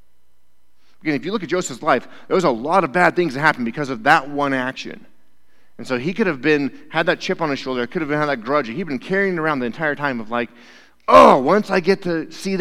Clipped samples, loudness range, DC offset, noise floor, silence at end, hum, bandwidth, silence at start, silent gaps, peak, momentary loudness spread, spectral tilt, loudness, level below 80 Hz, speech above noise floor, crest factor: under 0.1%; 5 LU; 0.9%; -66 dBFS; 0 s; none; 15.5 kHz; 1.05 s; none; 0 dBFS; 10 LU; -5.5 dB/octave; -19 LUFS; -54 dBFS; 48 dB; 20 dB